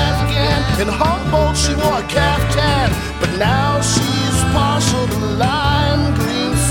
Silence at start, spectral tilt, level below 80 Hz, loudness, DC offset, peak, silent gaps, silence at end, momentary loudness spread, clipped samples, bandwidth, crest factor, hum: 0 s; -4.5 dB/octave; -24 dBFS; -16 LUFS; under 0.1%; -2 dBFS; none; 0 s; 3 LU; under 0.1%; 17.5 kHz; 14 dB; none